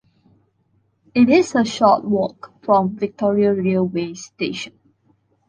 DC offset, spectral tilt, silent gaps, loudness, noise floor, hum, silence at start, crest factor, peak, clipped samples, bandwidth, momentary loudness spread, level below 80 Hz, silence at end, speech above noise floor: under 0.1%; -6 dB/octave; none; -18 LUFS; -64 dBFS; none; 1.15 s; 18 dB; -2 dBFS; under 0.1%; 9.8 kHz; 13 LU; -60 dBFS; 0.8 s; 46 dB